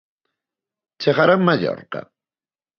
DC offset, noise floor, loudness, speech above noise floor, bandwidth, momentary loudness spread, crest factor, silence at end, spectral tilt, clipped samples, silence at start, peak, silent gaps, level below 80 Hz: under 0.1%; under -90 dBFS; -18 LUFS; over 72 dB; 6.6 kHz; 17 LU; 20 dB; 0.75 s; -7.5 dB/octave; under 0.1%; 1 s; -2 dBFS; none; -66 dBFS